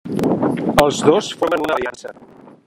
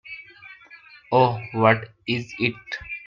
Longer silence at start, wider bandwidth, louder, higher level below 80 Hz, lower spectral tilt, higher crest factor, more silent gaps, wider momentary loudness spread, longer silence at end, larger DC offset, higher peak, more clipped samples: about the same, 0.05 s vs 0.05 s; first, 16 kHz vs 7.4 kHz; first, -17 LUFS vs -23 LUFS; first, -46 dBFS vs -58 dBFS; second, -5 dB/octave vs -7 dB/octave; about the same, 18 dB vs 22 dB; neither; second, 13 LU vs 22 LU; first, 0.55 s vs 0.05 s; neither; about the same, 0 dBFS vs -2 dBFS; neither